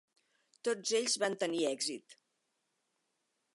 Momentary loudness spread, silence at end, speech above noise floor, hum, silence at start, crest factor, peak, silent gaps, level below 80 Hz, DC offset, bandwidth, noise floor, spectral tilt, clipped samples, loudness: 7 LU; 1.4 s; 48 dB; none; 0.65 s; 20 dB; -18 dBFS; none; under -90 dBFS; under 0.1%; 11.5 kHz; -82 dBFS; -2 dB/octave; under 0.1%; -34 LUFS